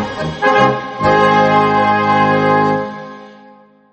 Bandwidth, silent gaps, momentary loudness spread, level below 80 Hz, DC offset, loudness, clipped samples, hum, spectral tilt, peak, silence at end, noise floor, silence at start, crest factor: 8.4 kHz; none; 11 LU; -46 dBFS; under 0.1%; -13 LUFS; under 0.1%; none; -6.5 dB/octave; 0 dBFS; 0.6 s; -44 dBFS; 0 s; 14 dB